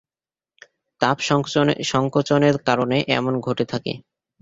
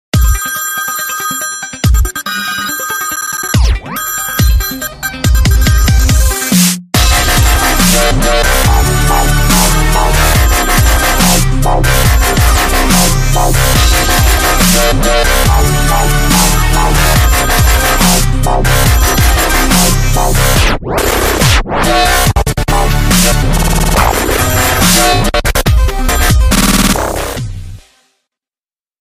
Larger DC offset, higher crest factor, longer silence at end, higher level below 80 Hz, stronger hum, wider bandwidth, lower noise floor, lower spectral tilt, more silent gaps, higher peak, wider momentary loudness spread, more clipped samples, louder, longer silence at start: neither; first, 22 dB vs 10 dB; second, 0.4 s vs 1.25 s; second, -56 dBFS vs -12 dBFS; neither; second, 8 kHz vs 16 kHz; about the same, under -90 dBFS vs under -90 dBFS; first, -5.5 dB/octave vs -3.5 dB/octave; neither; about the same, 0 dBFS vs 0 dBFS; about the same, 7 LU vs 7 LU; neither; second, -20 LUFS vs -10 LUFS; first, 1 s vs 0.15 s